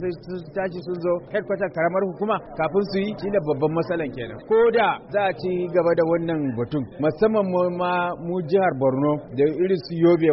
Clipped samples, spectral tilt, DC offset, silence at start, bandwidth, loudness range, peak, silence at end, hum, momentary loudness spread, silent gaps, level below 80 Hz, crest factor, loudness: under 0.1%; -6 dB/octave; under 0.1%; 0 s; 5.8 kHz; 3 LU; -8 dBFS; 0 s; none; 8 LU; none; -54 dBFS; 14 dB; -23 LUFS